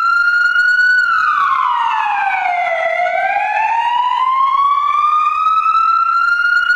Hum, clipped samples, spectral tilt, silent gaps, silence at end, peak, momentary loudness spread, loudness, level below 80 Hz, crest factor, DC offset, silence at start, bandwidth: none; under 0.1%; -0.5 dB/octave; none; 0 s; -4 dBFS; 4 LU; -13 LUFS; -54 dBFS; 10 dB; under 0.1%; 0 s; 10.5 kHz